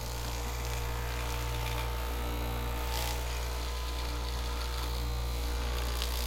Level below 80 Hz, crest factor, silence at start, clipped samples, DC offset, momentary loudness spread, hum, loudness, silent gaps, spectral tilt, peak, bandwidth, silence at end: -36 dBFS; 22 dB; 0 s; under 0.1%; under 0.1%; 2 LU; none; -35 LUFS; none; -4 dB/octave; -12 dBFS; 17 kHz; 0 s